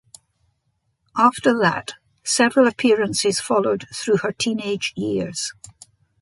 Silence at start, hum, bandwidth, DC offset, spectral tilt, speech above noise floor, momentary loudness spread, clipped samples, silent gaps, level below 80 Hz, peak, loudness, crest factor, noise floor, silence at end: 1.15 s; none; 11.5 kHz; under 0.1%; -3.5 dB/octave; 51 dB; 12 LU; under 0.1%; none; -60 dBFS; -2 dBFS; -20 LUFS; 20 dB; -71 dBFS; 0.5 s